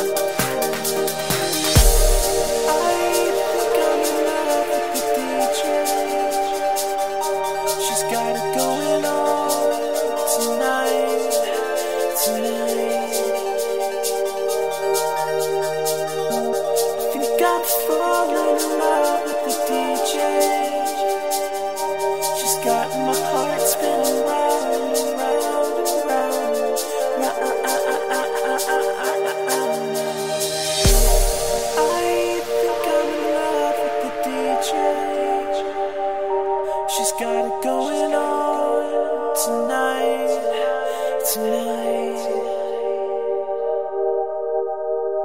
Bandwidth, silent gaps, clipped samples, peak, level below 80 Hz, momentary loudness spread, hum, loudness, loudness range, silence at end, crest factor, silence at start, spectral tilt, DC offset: 16.5 kHz; none; under 0.1%; -2 dBFS; -32 dBFS; 4 LU; none; -21 LUFS; 3 LU; 0 s; 18 dB; 0 s; -3 dB/octave; 0.9%